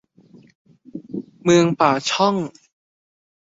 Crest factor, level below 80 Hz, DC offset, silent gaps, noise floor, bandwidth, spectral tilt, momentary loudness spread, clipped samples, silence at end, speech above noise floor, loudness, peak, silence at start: 20 dB; -62 dBFS; under 0.1%; none; -50 dBFS; 7.8 kHz; -5 dB/octave; 19 LU; under 0.1%; 0.9 s; 33 dB; -18 LUFS; -2 dBFS; 0.95 s